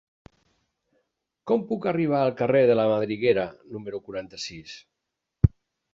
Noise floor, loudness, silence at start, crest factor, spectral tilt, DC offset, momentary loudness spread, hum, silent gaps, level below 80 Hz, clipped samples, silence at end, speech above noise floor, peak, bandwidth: -83 dBFS; -25 LUFS; 1.45 s; 24 dB; -7 dB/octave; under 0.1%; 18 LU; none; none; -42 dBFS; under 0.1%; 0.45 s; 59 dB; -2 dBFS; 7.8 kHz